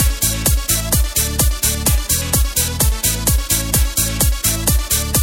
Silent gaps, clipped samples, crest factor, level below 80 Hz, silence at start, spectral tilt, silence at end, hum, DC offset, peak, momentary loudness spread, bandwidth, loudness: none; under 0.1%; 16 dB; -20 dBFS; 0 s; -3 dB/octave; 0 s; none; under 0.1%; 0 dBFS; 2 LU; 17 kHz; -16 LUFS